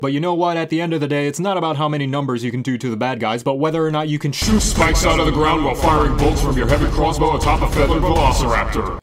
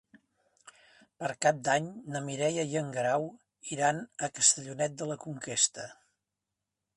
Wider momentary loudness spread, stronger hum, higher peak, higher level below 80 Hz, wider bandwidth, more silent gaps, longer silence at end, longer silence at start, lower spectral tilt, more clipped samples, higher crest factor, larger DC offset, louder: second, 5 LU vs 14 LU; neither; first, -2 dBFS vs -8 dBFS; first, -24 dBFS vs -76 dBFS; first, 16 kHz vs 11.5 kHz; neither; second, 0 s vs 1.05 s; second, 0 s vs 0.65 s; first, -5 dB/octave vs -2.5 dB/octave; neither; second, 16 dB vs 24 dB; neither; first, -18 LUFS vs -30 LUFS